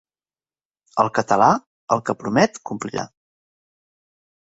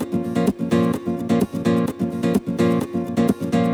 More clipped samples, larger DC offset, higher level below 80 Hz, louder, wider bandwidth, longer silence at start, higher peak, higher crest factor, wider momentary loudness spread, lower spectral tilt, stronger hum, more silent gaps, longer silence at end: neither; neither; second, -60 dBFS vs -52 dBFS; about the same, -21 LUFS vs -21 LUFS; second, 8 kHz vs 16.5 kHz; first, 0.95 s vs 0 s; about the same, -2 dBFS vs -4 dBFS; first, 22 dB vs 16 dB; first, 13 LU vs 3 LU; second, -5.5 dB/octave vs -7.5 dB/octave; neither; first, 1.67-1.88 s vs none; first, 1.55 s vs 0 s